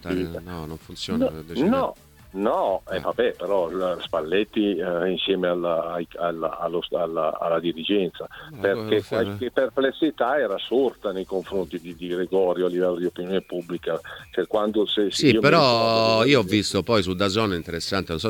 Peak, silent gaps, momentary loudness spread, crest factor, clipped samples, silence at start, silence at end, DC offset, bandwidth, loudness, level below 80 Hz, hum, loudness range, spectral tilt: -2 dBFS; none; 11 LU; 20 dB; under 0.1%; 0 s; 0 s; under 0.1%; 18.5 kHz; -23 LUFS; -52 dBFS; none; 6 LU; -5.5 dB/octave